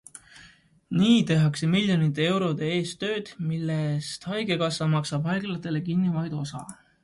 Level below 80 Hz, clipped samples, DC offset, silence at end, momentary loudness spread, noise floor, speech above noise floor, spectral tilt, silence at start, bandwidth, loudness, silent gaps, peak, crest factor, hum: -62 dBFS; under 0.1%; under 0.1%; 0.3 s; 11 LU; -55 dBFS; 30 dB; -6 dB/octave; 0.15 s; 11.5 kHz; -26 LUFS; none; -10 dBFS; 16 dB; none